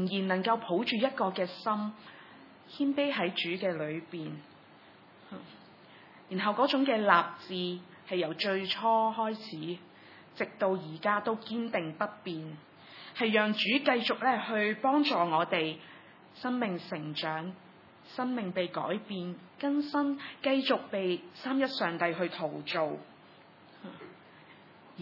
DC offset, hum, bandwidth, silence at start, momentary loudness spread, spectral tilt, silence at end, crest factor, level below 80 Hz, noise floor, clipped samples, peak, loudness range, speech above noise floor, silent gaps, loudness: under 0.1%; none; 6 kHz; 0 s; 20 LU; -7 dB/octave; 0 s; 26 dB; -90 dBFS; -56 dBFS; under 0.1%; -8 dBFS; 6 LU; 25 dB; none; -31 LUFS